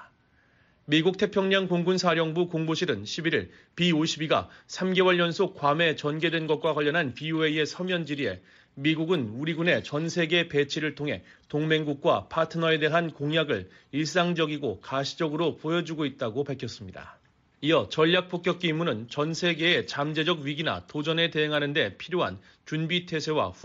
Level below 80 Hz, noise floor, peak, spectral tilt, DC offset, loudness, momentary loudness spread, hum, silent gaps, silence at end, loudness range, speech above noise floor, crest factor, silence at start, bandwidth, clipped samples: -66 dBFS; -64 dBFS; -10 dBFS; -3.5 dB/octave; under 0.1%; -27 LUFS; 8 LU; none; none; 0.1 s; 3 LU; 37 dB; 16 dB; 0 s; 7.8 kHz; under 0.1%